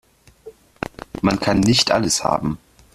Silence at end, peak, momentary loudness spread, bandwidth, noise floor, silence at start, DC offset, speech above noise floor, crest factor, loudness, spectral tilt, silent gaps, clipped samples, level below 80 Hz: 0.4 s; -2 dBFS; 17 LU; 14 kHz; -44 dBFS; 0.45 s; under 0.1%; 26 dB; 18 dB; -18 LUFS; -4 dB/octave; none; under 0.1%; -42 dBFS